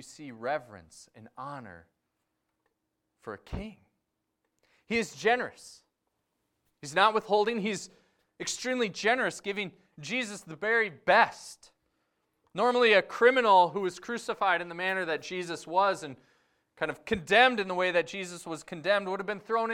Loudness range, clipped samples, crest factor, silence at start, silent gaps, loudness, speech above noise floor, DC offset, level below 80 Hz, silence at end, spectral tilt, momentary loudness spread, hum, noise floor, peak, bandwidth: 16 LU; under 0.1%; 24 dB; 0 s; none; -28 LUFS; 53 dB; under 0.1%; -60 dBFS; 0 s; -3.5 dB/octave; 19 LU; none; -82 dBFS; -8 dBFS; 15.5 kHz